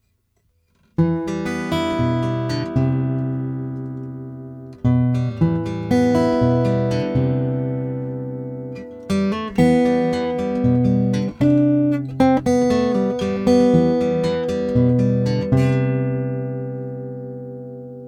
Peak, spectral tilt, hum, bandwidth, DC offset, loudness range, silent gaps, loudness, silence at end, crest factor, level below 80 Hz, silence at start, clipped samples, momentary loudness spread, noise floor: -2 dBFS; -8 dB/octave; none; 11 kHz; under 0.1%; 5 LU; none; -19 LUFS; 0 s; 18 dB; -44 dBFS; 1 s; under 0.1%; 14 LU; -65 dBFS